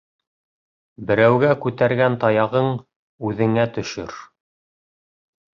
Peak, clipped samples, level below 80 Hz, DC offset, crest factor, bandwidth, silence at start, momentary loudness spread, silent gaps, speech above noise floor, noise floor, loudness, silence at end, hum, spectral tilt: -2 dBFS; under 0.1%; -56 dBFS; under 0.1%; 20 dB; 7.4 kHz; 1 s; 16 LU; 2.96-3.18 s; over 71 dB; under -90 dBFS; -19 LUFS; 1.35 s; none; -7 dB/octave